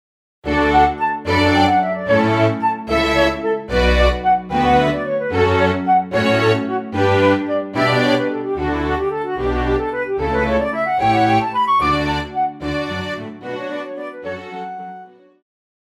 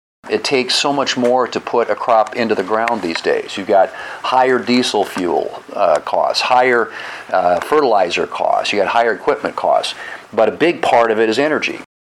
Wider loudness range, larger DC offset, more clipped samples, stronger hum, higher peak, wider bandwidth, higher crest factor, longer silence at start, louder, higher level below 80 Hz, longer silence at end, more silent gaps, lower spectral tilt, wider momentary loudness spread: first, 5 LU vs 1 LU; neither; neither; neither; about the same, -2 dBFS vs -2 dBFS; about the same, 14 kHz vs 14 kHz; about the same, 16 dB vs 14 dB; first, 0.45 s vs 0.25 s; about the same, -17 LUFS vs -16 LUFS; first, -32 dBFS vs -60 dBFS; first, 0.85 s vs 0.2 s; neither; first, -6.5 dB/octave vs -3.5 dB/octave; first, 13 LU vs 7 LU